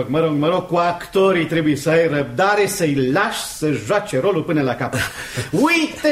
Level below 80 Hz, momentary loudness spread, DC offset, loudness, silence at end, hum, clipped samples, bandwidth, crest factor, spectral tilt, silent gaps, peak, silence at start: -48 dBFS; 6 LU; under 0.1%; -18 LUFS; 0 s; none; under 0.1%; 16 kHz; 14 dB; -5 dB/octave; none; -4 dBFS; 0 s